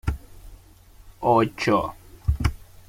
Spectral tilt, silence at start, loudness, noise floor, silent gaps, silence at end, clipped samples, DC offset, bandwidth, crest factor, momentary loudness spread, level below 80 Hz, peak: -6.5 dB/octave; 0.05 s; -24 LUFS; -50 dBFS; none; 0.25 s; under 0.1%; under 0.1%; 16.5 kHz; 18 dB; 12 LU; -34 dBFS; -6 dBFS